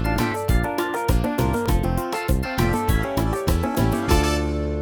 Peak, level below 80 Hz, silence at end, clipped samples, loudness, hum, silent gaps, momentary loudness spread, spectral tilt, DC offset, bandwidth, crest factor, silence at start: -6 dBFS; -26 dBFS; 0 s; under 0.1%; -22 LUFS; none; none; 4 LU; -6 dB/octave; under 0.1%; 19 kHz; 16 dB; 0 s